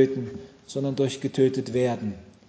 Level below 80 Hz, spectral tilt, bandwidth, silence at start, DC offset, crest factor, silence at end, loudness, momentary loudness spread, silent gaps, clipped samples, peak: -58 dBFS; -6.5 dB/octave; 8 kHz; 0 s; under 0.1%; 18 dB; 0.2 s; -26 LUFS; 12 LU; none; under 0.1%; -8 dBFS